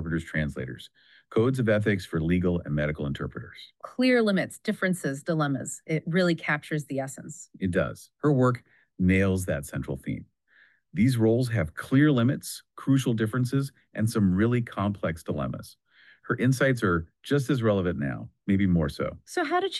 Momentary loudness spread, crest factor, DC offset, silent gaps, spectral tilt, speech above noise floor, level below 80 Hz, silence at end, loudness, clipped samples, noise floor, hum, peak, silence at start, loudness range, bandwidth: 12 LU; 16 dB; under 0.1%; none; -6.5 dB/octave; 35 dB; -50 dBFS; 0 s; -27 LUFS; under 0.1%; -62 dBFS; none; -10 dBFS; 0 s; 3 LU; 12.5 kHz